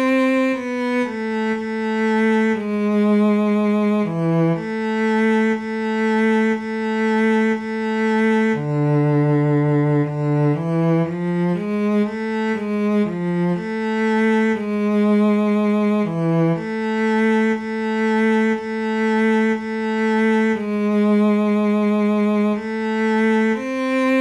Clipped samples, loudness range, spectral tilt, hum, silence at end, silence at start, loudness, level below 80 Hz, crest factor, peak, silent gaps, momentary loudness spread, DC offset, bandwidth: under 0.1%; 2 LU; -8 dB/octave; none; 0 s; 0 s; -19 LUFS; -60 dBFS; 10 dB; -8 dBFS; none; 5 LU; under 0.1%; 9.6 kHz